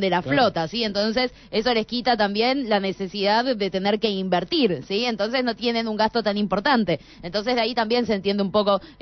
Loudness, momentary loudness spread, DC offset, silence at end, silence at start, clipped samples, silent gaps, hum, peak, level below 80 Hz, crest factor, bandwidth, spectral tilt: -22 LUFS; 4 LU; under 0.1%; 0.1 s; 0 s; under 0.1%; none; none; -8 dBFS; -52 dBFS; 14 dB; 6.4 kHz; -5.5 dB/octave